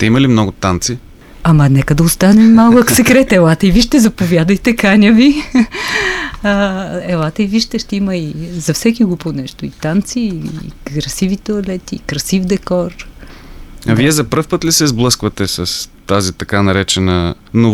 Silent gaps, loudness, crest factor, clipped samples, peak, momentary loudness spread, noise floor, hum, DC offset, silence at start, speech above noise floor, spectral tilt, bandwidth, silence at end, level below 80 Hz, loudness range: none; -12 LUFS; 12 dB; under 0.1%; 0 dBFS; 13 LU; -33 dBFS; none; under 0.1%; 0 s; 21 dB; -5 dB/octave; 16.5 kHz; 0 s; -32 dBFS; 9 LU